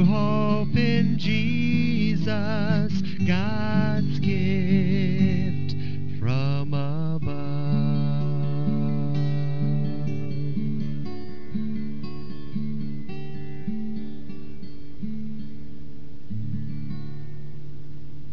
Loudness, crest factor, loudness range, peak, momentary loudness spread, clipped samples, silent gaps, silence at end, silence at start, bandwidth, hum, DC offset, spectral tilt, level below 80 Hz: -26 LUFS; 16 dB; 13 LU; -8 dBFS; 18 LU; under 0.1%; none; 0 s; 0 s; 6 kHz; none; 6%; -8.5 dB/octave; -50 dBFS